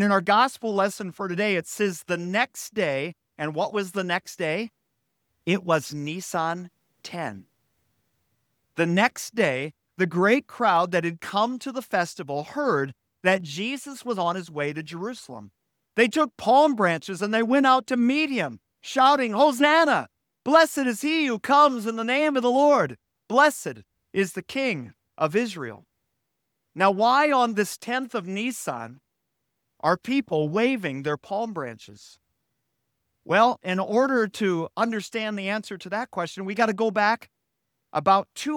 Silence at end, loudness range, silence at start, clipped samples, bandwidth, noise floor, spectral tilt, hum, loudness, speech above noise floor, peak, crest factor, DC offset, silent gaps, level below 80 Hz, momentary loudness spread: 0 s; 7 LU; 0 s; under 0.1%; 18.5 kHz; -79 dBFS; -4.5 dB/octave; none; -24 LUFS; 56 dB; -4 dBFS; 20 dB; under 0.1%; none; -72 dBFS; 14 LU